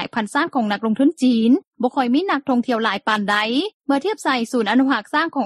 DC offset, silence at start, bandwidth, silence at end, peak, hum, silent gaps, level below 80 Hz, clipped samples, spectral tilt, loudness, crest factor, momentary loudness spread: under 0.1%; 0 s; 12.5 kHz; 0 s; -4 dBFS; none; 1.67-1.72 s, 3.74-3.80 s; -68 dBFS; under 0.1%; -4.5 dB/octave; -19 LUFS; 14 dB; 4 LU